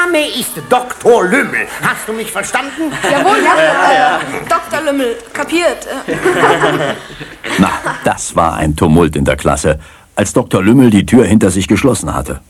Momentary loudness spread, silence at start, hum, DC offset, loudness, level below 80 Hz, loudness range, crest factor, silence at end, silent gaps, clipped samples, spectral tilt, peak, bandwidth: 10 LU; 0 s; none; under 0.1%; -12 LUFS; -32 dBFS; 3 LU; 12 dB; 0.1 s; none; 0.3%; -5 dB/octave; 0 dBFS; 16 kHz